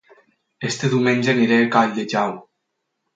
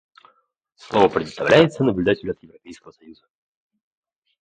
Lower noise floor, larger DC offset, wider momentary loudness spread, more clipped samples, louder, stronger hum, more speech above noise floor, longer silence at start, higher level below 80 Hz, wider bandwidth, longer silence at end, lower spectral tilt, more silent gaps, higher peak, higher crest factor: first, -76 dBFS vs -65 dBFS; neither; about the same, 11 LU vs 12 LU; neither; about the same, -19 LUFS vs -19 LUFS; neither; first, 58 dB vs 45 dB; second, 0.6 s vs 0.9 s; second, -66 dBFS vs -54 dBFS; about the same, 9 kHz vs 9.4 kHz; second, 0.75 s vs 1.3 s; about the same, -5.5 dB/octave vs -6.5 dB/octave; neither; about the same, 0 dBFS vs 0 dBFS; about the same, 20 dB vs 22 dB